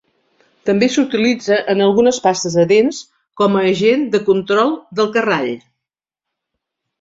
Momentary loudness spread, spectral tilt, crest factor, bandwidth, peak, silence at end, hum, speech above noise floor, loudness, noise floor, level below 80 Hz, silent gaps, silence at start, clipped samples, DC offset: 6 LU; -5 dB/octave; 16 dB; 7.8 kHz; -2 dBFS; 1.45 s; none; 69 dB; -15 LUFS; -83 dBFS; -60 dBFS; none; 0.65 s; under 0.1%; under 0.1%